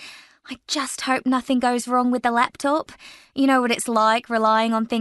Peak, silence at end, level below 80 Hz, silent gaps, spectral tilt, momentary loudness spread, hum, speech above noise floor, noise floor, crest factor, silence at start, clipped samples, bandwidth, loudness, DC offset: -4 dBFS; 0 s; -64 dBFS; none; -3 dB/octave; 12 LU; none; 22 dB; -43 dBFS; 18 dB; 0 s; under 0.1%; 12 kHz; -21 LUFS; under 0.1%